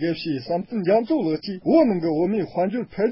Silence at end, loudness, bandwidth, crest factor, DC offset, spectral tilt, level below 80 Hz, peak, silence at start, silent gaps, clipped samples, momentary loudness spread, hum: 0 s; -22 LUFS; 5.8 kHz; 16 dB; under 0.1%; -11.5 dB/octave; -58 dBFS; -6 dBFS; 0 s; none; under 0.1%; 8 LU; none